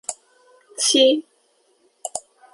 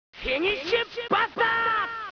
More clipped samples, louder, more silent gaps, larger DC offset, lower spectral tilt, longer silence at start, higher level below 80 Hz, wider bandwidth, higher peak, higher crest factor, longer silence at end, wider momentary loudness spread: neither; first, -19 LUFS vs -25 LUFS; neither; neither; second, 0 dB/octave vs -4 dB/octave; about the same, 0.1 s vs 0.15 s; second, -72 dBFS vs -52 dBFS; first, 11.5 kHz vs 5.4 kHz; first, -4 dBFS vs -10 dBFS; about the same, 20 dB vs 16 dB; first, 0.35 s vs 0.1 s; first, 22 LU vs 4 LU